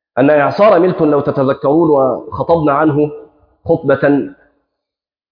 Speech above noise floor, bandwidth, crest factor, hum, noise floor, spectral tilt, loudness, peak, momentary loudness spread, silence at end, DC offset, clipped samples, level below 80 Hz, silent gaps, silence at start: 72 dB; 5.2 kHz; 12 dB; none; -83 dBFS; -10 dB/octave; -12 LUFS; 0 dBFS; 8 LU; 1 s; under 0.1%; under 0.1%; -48 dBFS; none; 0.15 s